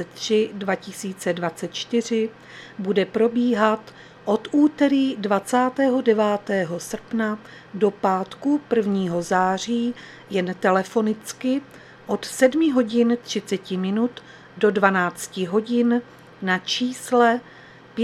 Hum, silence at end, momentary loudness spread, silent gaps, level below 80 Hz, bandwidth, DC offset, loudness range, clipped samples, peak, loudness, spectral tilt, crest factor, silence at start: none; 0 s; 10 LU; none; -66 dBFS; 14.5 kHz; under 0.1%; 3 LU; under 0.1%; 0 dBFS; -22 LUFS; -5 dB/octave; 22 dB; 0 s